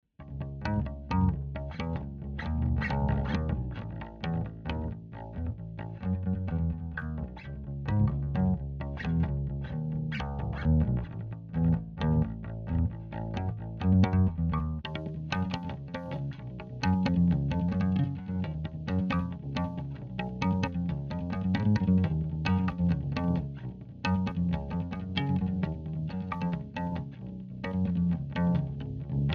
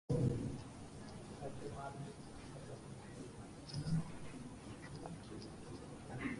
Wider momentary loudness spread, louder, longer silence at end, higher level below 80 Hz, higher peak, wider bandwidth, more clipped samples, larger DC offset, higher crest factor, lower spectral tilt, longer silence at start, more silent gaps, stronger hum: about the same, 11 LU vs 12 LU; first, -31 LUFS vs -47 LUFS; about the same, 0 s vs 0 s; first, -40 dBFS vs -60 dBFS; first, -12 dBFS vs -24 dBFS; second, 6.8 kHz vs 11.5 kHz; neither; neither; about the same, 18 dB vs 20 dB; first, -8.5 dB/octave vs -6.5 dB/octave; about the same, 0.2 s vs 0.1 s; neither; neither